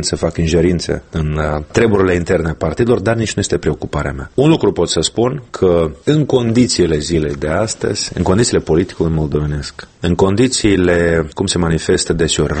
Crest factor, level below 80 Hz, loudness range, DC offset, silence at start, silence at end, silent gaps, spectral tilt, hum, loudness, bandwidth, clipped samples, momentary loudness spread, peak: 14 dB; -30 dBFS; 1 LU; under 0.1%; 0 s; 0 s; none; -5 dB/octave; none; -15 LUFS; 8.8 kHz; under 0.1%; 7 LU; 0 dBFS